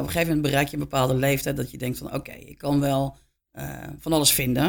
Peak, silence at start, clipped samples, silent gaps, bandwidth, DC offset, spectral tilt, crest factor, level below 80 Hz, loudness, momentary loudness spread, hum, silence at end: -4 dBFS; 0 s; under 0.1%; none; 19 kHz; under 0.1%; -4.5 dB/octave; 22 dB; -46 dBFS; -24 LUFS; 16 LU; none; 0 s